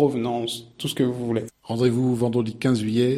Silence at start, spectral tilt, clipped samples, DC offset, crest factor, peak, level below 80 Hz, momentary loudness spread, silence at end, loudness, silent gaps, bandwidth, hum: 0 s; -6.5 dB/octave; under 0.1%; under 0.1%; 16 dB; -6 dBFS; -60 dBFS; 9 LU; 0 s; -24 LUFS; none; 14 kHz; none